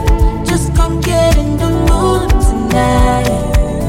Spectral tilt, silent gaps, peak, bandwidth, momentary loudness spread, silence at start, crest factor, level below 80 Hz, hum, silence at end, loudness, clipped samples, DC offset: -6 dB/octave; none; 0 dBFS; 16 kHz; 3 LU; 0 s; 10 dB; -14 dBFS; none; 0 s; -13 LUFS; under 0.1%; under 0.1%